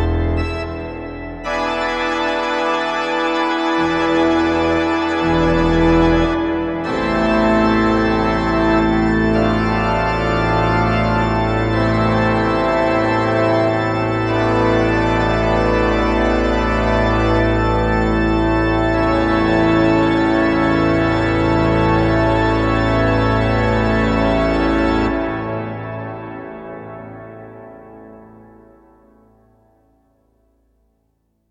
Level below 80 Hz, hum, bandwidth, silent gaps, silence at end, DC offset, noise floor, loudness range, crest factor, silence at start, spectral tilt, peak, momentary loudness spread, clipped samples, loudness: -28 dBFS; none; 8.4 kHz; none; 3.25 s; under 0.1%; -65 dBFS; 5 LU; 14 dB; 0 s; -7 dB/octave; -2 dBFS; 9 LU; under 0.1%; -16 LUFS